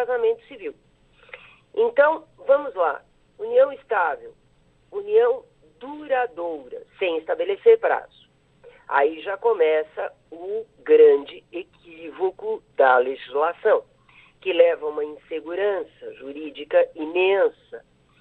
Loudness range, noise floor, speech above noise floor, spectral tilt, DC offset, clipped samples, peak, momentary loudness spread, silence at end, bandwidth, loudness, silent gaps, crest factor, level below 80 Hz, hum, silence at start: 4 LU; -59 dBFS; 38 dB; -6 dB/octave; under 0.1%; under 0.1%; -4 dBFS; 19 LU; 0.4 s; 4.1 kHz; -22 LUFS; none; 18 dB; -66 dBFS; none; 0 s